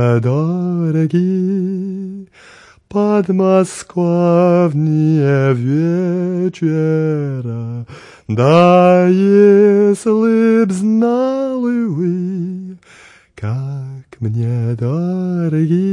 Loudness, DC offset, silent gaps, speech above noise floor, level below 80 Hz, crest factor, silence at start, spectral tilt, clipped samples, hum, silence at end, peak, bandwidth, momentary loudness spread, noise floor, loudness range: -14 LUFS; under 0.1%; none; 30 dB; -60 dBFS; 14 dB; 0 s; -8.5 dB/octave; under 0.1%; none; 0 s; 0 dBFS; 11 kHz; 15 LU; -44 dBFS; 9 LU